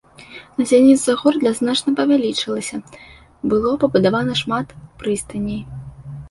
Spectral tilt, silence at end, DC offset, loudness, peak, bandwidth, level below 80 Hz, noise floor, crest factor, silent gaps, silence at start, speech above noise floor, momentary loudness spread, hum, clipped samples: -5 dB/octave; 0 s; under 0.1%; -18 LUFS; -2 dBFS; 11.5 kHz; -48 dBFS; -41 dBFS; 16 dB; none; 0.2 s; 24 dB; 21 LU; none; under 0.1%